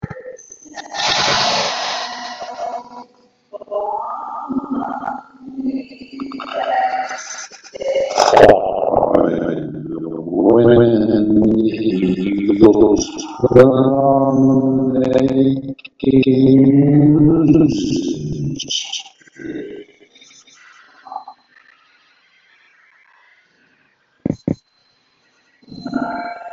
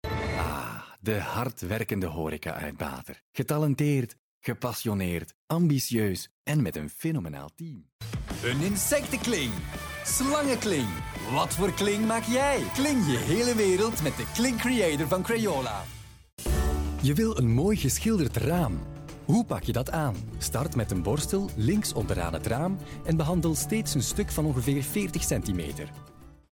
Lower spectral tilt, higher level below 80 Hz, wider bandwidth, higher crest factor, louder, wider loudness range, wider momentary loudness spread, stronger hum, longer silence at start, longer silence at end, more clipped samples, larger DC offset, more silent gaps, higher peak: about the same, -6 dB/octave vs -5 dB/octave; about the same, -44 dBFS vs -40 dBFS; second, 7.8 kHz vs 19 kHz; about the same, 16 dB vs 14 dB; first, -15 LUFS vs -28 LUFS; first, 18 LU vs 5 LU; first, 20 LU vs 11 LU; neither; about the same, 0.05 s vs 0.05 s; second, 0.05 s vs 0.25 s; first, 0.2% vs under 0.1%; neither; second, none vs 3.21-3.33 s, 4.19-4.41 s, 5.34-5.48 s, 6.31-6.45 s, 7.92-7.99 s, 16.33-16.37 s; first, 0 dBFS vs -14 dBFS